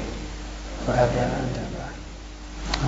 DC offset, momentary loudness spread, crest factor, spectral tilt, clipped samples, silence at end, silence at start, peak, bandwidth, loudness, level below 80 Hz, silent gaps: under 0.1%; 17 LU; 24 dB; -5.5 dB/octave; under 0.1%; 0 s; 0 s; -2 dBFS; 8 kHz; -27 LUFS; -36 dBFS; none